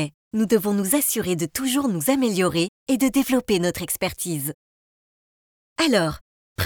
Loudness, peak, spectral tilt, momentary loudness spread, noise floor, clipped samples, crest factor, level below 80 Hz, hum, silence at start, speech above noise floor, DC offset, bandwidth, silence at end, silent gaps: -22 LUFS; -6 dBFS; -4 dB/octave; 8 LU; under -90 dBFS; under 0.1%; 18 dB; -52 dBFS; none; 0 s; over 68 dB; under 0.1%; over 20 kHz; 0 s; 0.14-0.31 s, 2.68-2.86 s, 4.54-5.76 s, 6.21-6.56 s